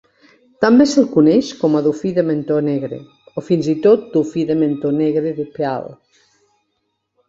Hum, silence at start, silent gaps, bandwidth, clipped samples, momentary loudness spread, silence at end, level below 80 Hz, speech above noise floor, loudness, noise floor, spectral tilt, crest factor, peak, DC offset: none; 0.6 s; none; 7.8 kHz; under 0.1%; 13 LU; 1.35 s; -58 dBFS; 55 dB; -16 LUFS; -71 dBFS; -6.5 dB/octave; 16 dB; 0 dBFS; under 0.1%